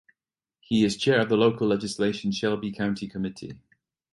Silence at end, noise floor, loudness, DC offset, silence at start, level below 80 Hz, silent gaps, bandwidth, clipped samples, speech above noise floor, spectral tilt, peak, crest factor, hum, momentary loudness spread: 0.55 s; under -90 dBFS; -25 LUFS; under 0.1%; 0.7 s; -60 dBFS; none; 11.5 kHz; under 0.1%; over 65 dB; -5.5 dB/octave; -6 dBFS; 20 dB; none; 11 LU